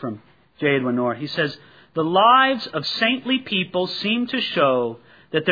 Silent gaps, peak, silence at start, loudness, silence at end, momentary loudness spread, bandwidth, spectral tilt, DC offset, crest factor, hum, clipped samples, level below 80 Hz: none; -4 dBFS; 0 s; -20 LUFS; 0 s; 12 LU; 5 kHz; -6 dB/octave; under 0.1%; 18 dB; none; under 0.1%; -68 dBFS